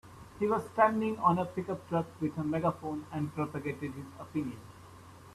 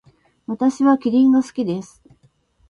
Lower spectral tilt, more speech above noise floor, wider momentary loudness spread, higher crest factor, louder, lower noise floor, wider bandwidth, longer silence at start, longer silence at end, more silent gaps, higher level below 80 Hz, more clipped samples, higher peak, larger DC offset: first, -8 dB/octave vs -6.5 dB/octave; second, 20 dB vs 42 dB; first, 22 LU vs 15 LU; about the same, 22 dB vs 18 dB; second, -33 LUFS vs -18 LUFS; second, -52 dBFS vs -59 dBFS; first, 14 kHz vs 10.5 kHz; second, 0.05 s vs 0.5 s; second, 0 s vs 0.85 s; neither; about the same, -64 dBFS vs -62 dBFS; neither; second, -12 dBFS vs -2 dBFS; neither